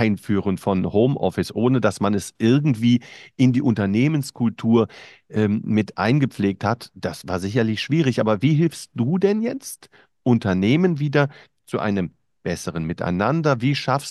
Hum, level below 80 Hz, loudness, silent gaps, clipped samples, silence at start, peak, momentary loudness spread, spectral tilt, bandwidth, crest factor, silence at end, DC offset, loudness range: none; -56 dBFS; -21 LUFS; none; under 0.1%; 0 s; -4 dBFS; 9 LU; -7 dB/octave; 12.5 kHz; 18 dB; 0 s; under 0.1%; 2 LU